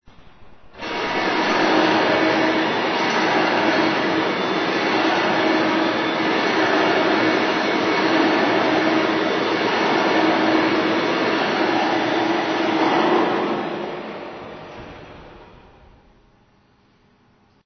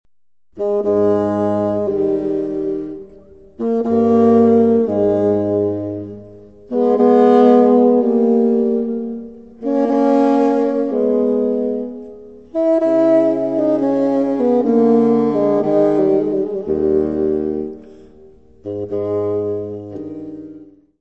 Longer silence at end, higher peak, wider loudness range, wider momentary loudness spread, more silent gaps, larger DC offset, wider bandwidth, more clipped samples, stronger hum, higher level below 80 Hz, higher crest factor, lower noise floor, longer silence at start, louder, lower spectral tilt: first, 2.2 s vs 0.35 s; about the same, -4 dBFS vs -2 dBFS; about the same, 5 LU vs 7 LU; second, 11 LU vs 17 LU; neither; second, under 0.1% vs 0.3%; about the same, 6.6 kHz vs 6.6 kHz; neither; neither; second, -58 dBFS vs -52 dBFS; about the same, 16 dB vs 14 dB; second, -57 dBFS vs -67 dBFS; second, 0.2 s vs 0.55 s; second, -19 LUFS vs -16 LUFS; second, -4.5 dB/octave vs -9.5 dB/octave